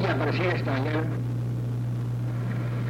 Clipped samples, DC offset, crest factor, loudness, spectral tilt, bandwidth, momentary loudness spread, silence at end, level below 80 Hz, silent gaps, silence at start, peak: under 0.1%; under 0.1%; 14 dB; -28 LUFS; -8 dB/octave; 7 kHz; 4 LU; 0 s; -48 dBFS; none; 0 s; -14 dBFS